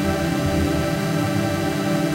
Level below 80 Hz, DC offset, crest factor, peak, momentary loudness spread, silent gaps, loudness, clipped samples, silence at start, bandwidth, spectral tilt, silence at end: -38 dBFS; under 0.1%; 14 dB; -6 dBFS; 1 LU; none; -22 LUFS; under 0.1%; 0 s; 16 kHz; -6 dB/octave; 0 s